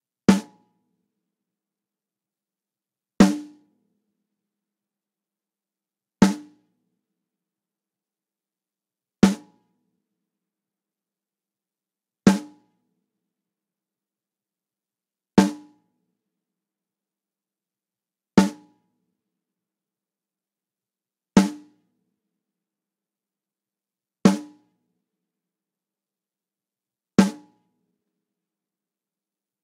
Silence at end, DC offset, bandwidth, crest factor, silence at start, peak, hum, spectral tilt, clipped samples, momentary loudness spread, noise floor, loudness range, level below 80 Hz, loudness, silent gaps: 2.3 s; under 0.1%; 14 kHz; 26 dB; 0.3 s; -2 dBFS; none; -6 dB/octave; under 0.1%; 9 LU; under -90 dBFS; 2 LU; -56 dBFS; -21 LUFS; none